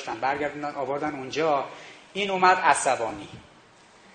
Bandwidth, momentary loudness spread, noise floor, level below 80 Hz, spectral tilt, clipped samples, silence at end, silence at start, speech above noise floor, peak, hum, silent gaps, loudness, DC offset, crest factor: 9.4 kHz; 17 LU; -54 dBFS; -64 dBFS; -3 dB/octave; under 0.1%; 0.7 s; 0 s; 28 dB; -4 dBFS; none; none; -25 LUFS; under 0.1%; 22 dB